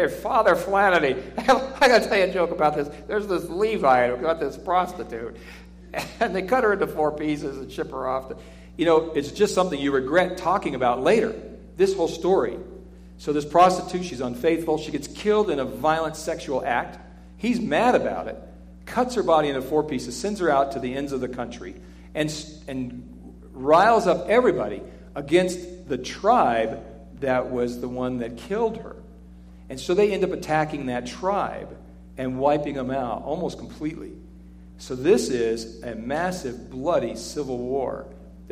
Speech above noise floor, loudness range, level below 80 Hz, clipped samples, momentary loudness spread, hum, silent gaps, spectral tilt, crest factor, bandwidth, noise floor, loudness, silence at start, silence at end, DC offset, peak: 22 dB; 6 LU; -46 dBFS; under 0.1%; 16 LU; none; none; -5 dB/octave; 18 dB; 15.5 kHz; -45 dBFS; -23 LUFS; 0 s; 0 s; under 0.1%; -6 dBFS